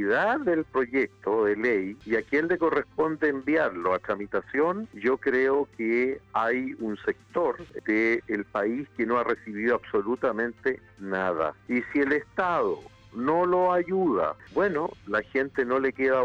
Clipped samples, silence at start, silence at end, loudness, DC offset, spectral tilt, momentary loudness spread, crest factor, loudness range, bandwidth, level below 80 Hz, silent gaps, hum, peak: under 0.1%; 0 s; 0 s; -27 LUFS; under 0.1%; -7.5 dB/octave; 6 LU; 14 dB; 2 LU; 7.4 kHz; -60 dBFS; none; none; -14 dBFS